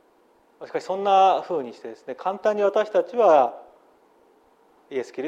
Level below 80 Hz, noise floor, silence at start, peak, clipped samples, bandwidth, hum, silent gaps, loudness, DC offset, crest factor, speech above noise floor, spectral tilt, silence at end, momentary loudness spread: -78 dBFS; -60 dBFS; 0.6 s; -6 dBFS; under 0.1%; 8.8 kHz; none; none; -22 LUFS; under 0.1%; 18 dB; 38 dB; -5 dB/octave; 0 s; 15 LU